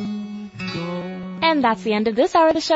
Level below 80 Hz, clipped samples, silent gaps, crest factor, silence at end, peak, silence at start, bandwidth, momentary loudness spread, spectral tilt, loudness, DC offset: -56 dBFS; under 0.1%; none; 14 dB; 0 s; -6 dBFS; 0 s; 8 kHz; 14 LU; -5 dB/octave; -20 LUFS; under 0.1%